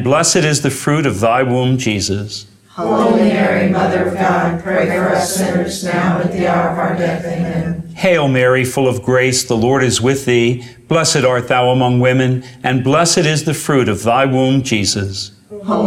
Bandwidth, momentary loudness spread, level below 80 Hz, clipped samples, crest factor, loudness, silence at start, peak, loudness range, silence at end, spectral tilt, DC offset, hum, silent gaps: 16 kHz; 7 LU; -46 dBFS; under 0.1%; 14 dB; -14 LUFS; 0 s; -2 dBFS; 2 LU; 0 s; -4.5 dB/octave; under 0.1%; none; none